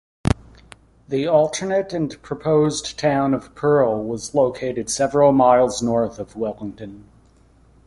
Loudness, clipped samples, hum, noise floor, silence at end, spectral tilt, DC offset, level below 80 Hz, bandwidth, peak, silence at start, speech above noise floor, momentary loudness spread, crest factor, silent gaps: -20 LUFS; under 0.1%; none; -53 dBFS; 0.85 s; -5.5 dB/octave; under 0.1%; -44 dBFS; 11.5 kHz; -2 dBFS; 0.25 s; 34 dB; 12 LU; 18 dB; none